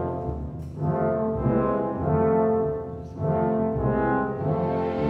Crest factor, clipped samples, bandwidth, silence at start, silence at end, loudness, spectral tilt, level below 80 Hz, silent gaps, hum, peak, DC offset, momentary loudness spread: 14 dB; under 0.1%; 5.2 kHz; 0 s; 0 s; -25 LUFS; -11 dB/octave; -42 dBFS; none; none; -10 dBFS; under 0.1%; 9 LU